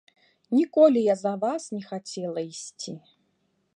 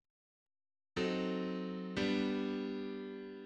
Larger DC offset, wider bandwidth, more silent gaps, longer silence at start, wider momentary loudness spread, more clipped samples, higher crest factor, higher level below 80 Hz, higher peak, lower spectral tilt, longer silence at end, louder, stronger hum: neither; first, 10.5 kHz vs 9 kHz; neither; second, 0.5 s vs 0.95 s; first, 18 LU vs 9 LU; neither; about the same, 20 dB vs 16 dB; second, -80 dBFS vs -68 dBFS; first, -6 dBFS vs -22 dBFS; about the same, -5.5 dB/octave vs -6.5 dB/octave; first, 0.8 s vs 0 s; first, -25 LUFS vs -38 LUFS; neither